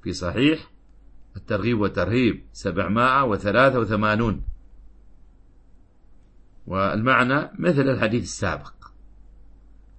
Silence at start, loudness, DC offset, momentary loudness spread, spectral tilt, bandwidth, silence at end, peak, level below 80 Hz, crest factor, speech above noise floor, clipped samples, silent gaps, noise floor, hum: 0.05 s; -22 LUFS; under 0.1%; 11 LU; -6 dB/octave; 8.8 kHz; 0.9 s; -4 dBFS; -44 dBFS; 20 dB; 29 dB; under 0.1%; none; -51 dBFS; none